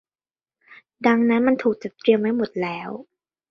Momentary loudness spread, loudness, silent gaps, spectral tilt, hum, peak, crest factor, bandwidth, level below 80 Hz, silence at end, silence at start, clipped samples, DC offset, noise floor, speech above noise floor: 13 LU; -21 LUFS; none; -7.5 dB/octave; none; -4 dBFS; 20 dB; 6.2 kHz; -66 dBFS; 0.5 s; 0.7 s; under 0.1%; under 0.1%; under -90 dBFS; over 70 dB